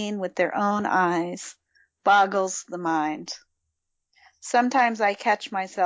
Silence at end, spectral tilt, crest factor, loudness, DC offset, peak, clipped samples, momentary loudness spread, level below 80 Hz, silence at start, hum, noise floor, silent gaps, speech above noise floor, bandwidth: 0 s; -4 dB/octave; 18 dB; -24 LUFS; under 0.1%; -8 dBFS; under 0.1%; 16 LU; -74 dBFS; 0 s; none; -79 dBFS; none; 55 dB; 8 kHz